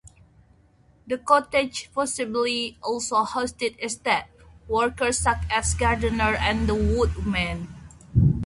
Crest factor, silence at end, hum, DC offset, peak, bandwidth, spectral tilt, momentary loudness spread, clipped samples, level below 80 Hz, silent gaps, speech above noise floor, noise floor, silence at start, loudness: 20 dB; 0 s; none; under 0.1%; -4 dBFS; 11.5 kHz; -4.5 dB/octave; 7 LU; under 0.1%; -34 dBFS; none; 34 dB; -58 dBFS; 0.05 s; -24 LUFS